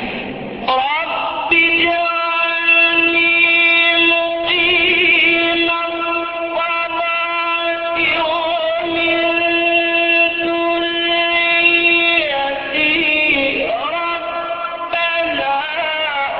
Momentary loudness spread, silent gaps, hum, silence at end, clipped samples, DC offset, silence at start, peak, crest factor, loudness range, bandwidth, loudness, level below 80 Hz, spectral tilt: 9 LU; none; none; 0 s; under 0.1%; under 0.1%; 0 s; 0 dBFS; 16 dB; 5 LU; 5.8 kHz; -14 LUFS; -50 dBFS; -8 dB/octave